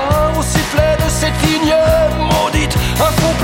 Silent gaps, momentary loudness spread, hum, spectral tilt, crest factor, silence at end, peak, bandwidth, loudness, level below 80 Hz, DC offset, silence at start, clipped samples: none; 3 LU; none; -4.5 dB/octave; 12 dB; 0 s; 0 dBFS; 17 kHz; -14 LUFS; -22 dBFS; under 0.1%; 0 s; under 0.1%